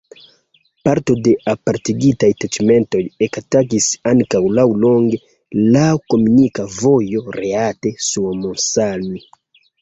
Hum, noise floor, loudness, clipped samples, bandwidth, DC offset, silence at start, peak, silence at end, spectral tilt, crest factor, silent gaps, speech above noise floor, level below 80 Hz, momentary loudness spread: none; -59 dBFS; -16 LUFS; under 0.1%; 8.2 kHz; under 0.1%; 0.85 s; -2 dBFS; 0.65 s; -5.5 dB/octave; 14 dB; none; 44 dB; -50 dBFS; 8 LU